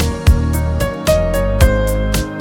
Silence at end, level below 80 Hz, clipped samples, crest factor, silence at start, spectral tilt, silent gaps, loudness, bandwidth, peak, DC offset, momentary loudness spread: 0 s; -18 dBFS; under 0.1%; 14 dB; 0 s; -6 dB/octave; none; -16 LUFS; 18 kHz; 0 dBFS; under 0.1%; 4 LU